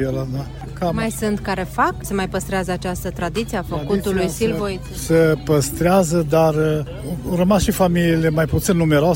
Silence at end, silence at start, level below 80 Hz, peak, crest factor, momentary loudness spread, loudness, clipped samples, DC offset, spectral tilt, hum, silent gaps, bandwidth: 0 s; 0 s; -34 dBFS; -4 dBFS; 14 dB; 9 LU; -19 LUFS; under 0.1%; under 0.1%; -6 dB/octave; none; none; 16.5 kHz